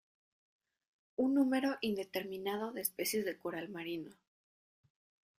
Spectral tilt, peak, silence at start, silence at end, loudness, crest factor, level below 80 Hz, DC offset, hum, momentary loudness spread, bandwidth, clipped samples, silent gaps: -4 dB/octave; -18 dBFS; 1.2 s; 1.3 s; -37 LUFS; 22 dB; -78 dBFS; under 0.1%; none; 11 LU; 15.5 kHz; under 0.1%; none